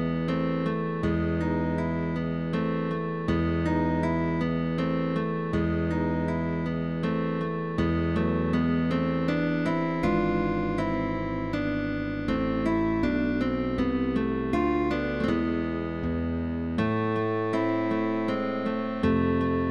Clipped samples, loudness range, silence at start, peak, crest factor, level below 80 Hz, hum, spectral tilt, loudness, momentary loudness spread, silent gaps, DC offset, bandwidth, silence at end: under 0.1%; 1 LU; 0 s; -12 dBFS; 14 dB; -42 dBFS; none; -8.5 dB/octave; -27 LUFS; 4 LU; none; 0.4%; 7.8 kHz; 0 s